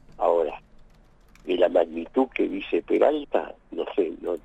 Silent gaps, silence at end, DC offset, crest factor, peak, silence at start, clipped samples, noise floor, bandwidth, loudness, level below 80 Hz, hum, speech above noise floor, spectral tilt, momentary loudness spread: none; 0.05 s; under 0.1%; 18 dB; -8 dBFS; 0.2 s; under 0.1%; -54 dBFS; 8.2 kHz; -25 LUFS; -54 dBFS; none; 29 dB; -6.5 dB/octave; 11 LU